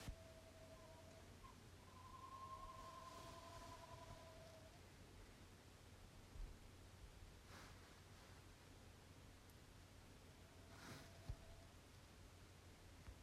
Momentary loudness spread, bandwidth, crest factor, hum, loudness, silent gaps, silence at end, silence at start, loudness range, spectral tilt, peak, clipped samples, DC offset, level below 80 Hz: 7 LU; 15 kHz; 20 dB; none; -62 LUFS; none; 0 s; 0 s; 5 LU; -4.5 dB/octave; -40 dBFS; under 0.1%; under 0.1%; -66 dBFS